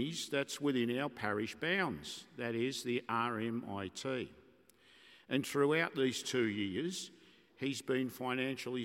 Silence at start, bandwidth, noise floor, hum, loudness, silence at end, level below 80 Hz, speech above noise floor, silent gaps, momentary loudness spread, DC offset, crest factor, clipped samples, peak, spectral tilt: 0 s; 16.5 kHz; -65 dBFS; none; -37 LUFS; 0 s; -78 dBFS; 29 dB; none; 9 LU; under 0.1%; 20 dB; under 0.1%; -18 dBFS; -4.5 dB/octave